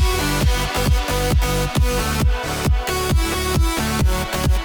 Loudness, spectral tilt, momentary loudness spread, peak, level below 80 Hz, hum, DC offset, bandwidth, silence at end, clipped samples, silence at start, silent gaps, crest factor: -20 LUFS; -4.5 dB/octave; 2 LU; -8 dBFS; -22 dBFS; none; under 0.1%; over 20 kHz; 0 s; under 0.1%; 0 s; none; 10 dB